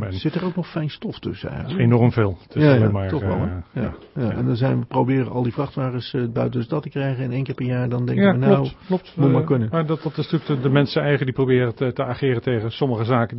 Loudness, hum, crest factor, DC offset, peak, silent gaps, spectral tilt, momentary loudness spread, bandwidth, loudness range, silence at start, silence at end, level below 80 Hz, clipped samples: -21 LUFS; none; 18 dB; under 0.1%; -2 dBFS; none; -12 dB/octave; 10 LU; 5.8 kHz; 3 LU; 0 s; 0 s; -48 dBFS; under 0.1%